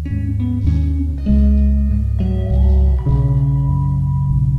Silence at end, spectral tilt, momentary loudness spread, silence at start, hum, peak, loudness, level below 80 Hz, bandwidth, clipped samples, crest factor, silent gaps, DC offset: 0 s; -11 dB/octave; 5 LU; 0 s; none; -4 dBFS; -17 LUFS; -18 dBFS; 3.5 kHz; under 0.1%; 10 dB; none; under 0.1%